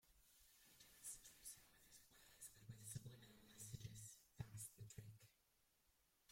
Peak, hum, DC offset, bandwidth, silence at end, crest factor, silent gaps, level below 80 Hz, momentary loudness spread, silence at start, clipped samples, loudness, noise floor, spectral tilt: -38 dBFS; none; under 0.1%; 16.5 kHz; 0 s; 24 dB; none; -78 dBFS; 12 LU; 0.05 s; under 0.1%; -59 LUFS; -83 dBFS; -3.5 dB/octave